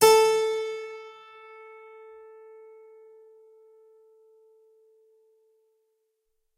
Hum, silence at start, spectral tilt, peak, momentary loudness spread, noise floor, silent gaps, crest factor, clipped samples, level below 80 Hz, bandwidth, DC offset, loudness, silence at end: none; 0 s; -1 dB/octave; -6 dBFS; 29 LU; -76 dBFS; none; 24 dB; under 0.1%; -70 dBFS; 16 kHz; under 0.1%; -24 LUFS; 5.5 s